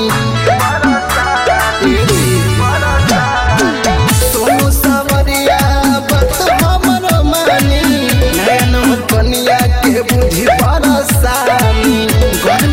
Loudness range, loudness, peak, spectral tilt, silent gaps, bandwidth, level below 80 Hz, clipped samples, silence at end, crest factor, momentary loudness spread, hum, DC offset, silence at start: 0 LU; -11 LUFS; 0 dBFS; -4.5 dB/octave; none; 16.5 kHz; -20 dBFS; under 0.1%; 0 s; 10 dB; 2 LU; none; under 0.1%; 0 s